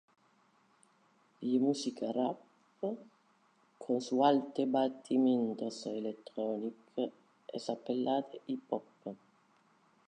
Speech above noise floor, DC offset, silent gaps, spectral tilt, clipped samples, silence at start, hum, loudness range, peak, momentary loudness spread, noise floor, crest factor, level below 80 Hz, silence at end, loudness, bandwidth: 36 dB; under 0.1%; none; -6 dB/octave; under 0.1%; 1.4 s; none; 5 LU; -14 dBFS; 17 LU; -70 dBFS; 22 dB; under -90 dBFS; 0.9 s; -35 LUFS; 9.8 kHz